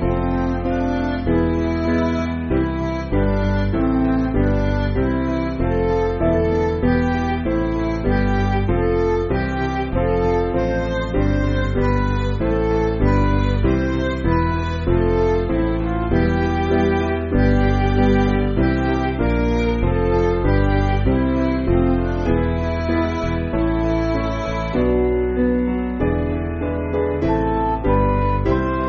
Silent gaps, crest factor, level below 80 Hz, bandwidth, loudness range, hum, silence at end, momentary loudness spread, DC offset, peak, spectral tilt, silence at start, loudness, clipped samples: none; 14 dB; -26 dBFS; 7.2 kHz; 2 LU; none; 0 s; 4 LU; under 0.1%; -4 dBFS; -7 dB/octave; 0 s; -19 LUFS; under 0.1%